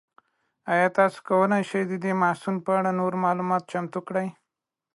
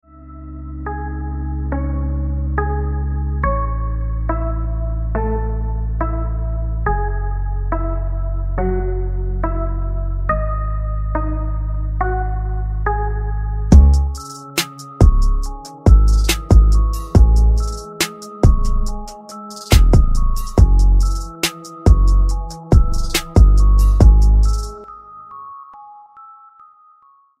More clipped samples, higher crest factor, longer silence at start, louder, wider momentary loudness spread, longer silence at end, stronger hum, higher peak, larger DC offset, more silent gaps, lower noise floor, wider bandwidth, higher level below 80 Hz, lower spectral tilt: neither; about the same, 18 dB vs 16 dB; first, 0.65 s vs 0.25 s; second, -25 LUFS vs -18 LUFS; second, 8 LU vs 14 LU; second, 0.65 s vs 1.15 s; neither; second, -8 dBFS vs 0 dBFS; neither; neither; first, -86 dBFS vs -52 dBFS; second, 11.5 kHz vs 15 kHz; second, -74 dBFS vs -16 dBFS; about the same, -7 dB/octave vs -6 dB/octave